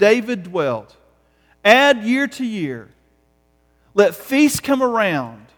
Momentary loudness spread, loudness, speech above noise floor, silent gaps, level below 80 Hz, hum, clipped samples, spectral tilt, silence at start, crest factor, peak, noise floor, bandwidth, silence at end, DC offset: 13 LU; -17 LUFS; 43 dB; none; -56 dBFS; none; under 0.1%; -4 dB/octave; 0 s; 18 dB; 0 dBFS; -60 dBFS; over 20 kHz; 0.2 s; under 0.1%